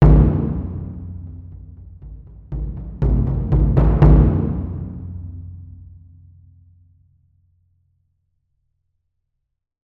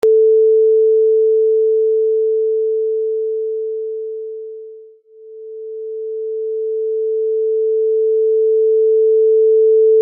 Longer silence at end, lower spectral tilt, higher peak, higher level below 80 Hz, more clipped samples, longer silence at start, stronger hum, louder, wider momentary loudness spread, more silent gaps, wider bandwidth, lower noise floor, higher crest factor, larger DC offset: first, 4.3 s vs 0 s; first, -12 dB/octave vs -6 dB/octave; first, -2 dBFS vs -6 dBFS; first, -22 dBFS vs -82 dBFS; neither; about the same, 0 s vs 0.05 s; neither; second, -18 LUFS vs -15 LUFS; first, 27 LU vs 16 LU; neither; first, 3.1 kHz vs 1.2 kHz; first, -76 dBFS vs -41 dBFS; first, 18 dB vs 8 dB; neither